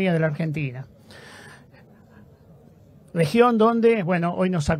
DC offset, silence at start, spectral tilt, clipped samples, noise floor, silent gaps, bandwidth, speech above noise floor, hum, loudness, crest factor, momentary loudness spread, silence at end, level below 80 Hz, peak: under 0.1%; 0 s; -7 dB/octave; under 0.1%; -50 dBFS; none; 15 kHz; 30 dB; none; -21 LUFS; 20 dB; 25 LU; 0 s; -48 dBFS; -4 dBFS